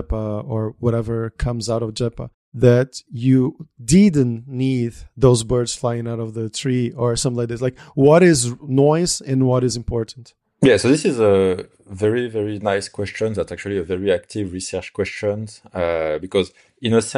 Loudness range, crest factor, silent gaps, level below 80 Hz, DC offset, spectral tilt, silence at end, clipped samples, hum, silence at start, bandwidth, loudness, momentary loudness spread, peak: 6 LU; 18 dB; 2.34-2.52 s; -40 dBFS; under 0.1%; -6 dB/octave; 0 s; under 0.1%; none; 0 s; 12.5 kHz; -19 LUFS; 11 LU; -2 dBFS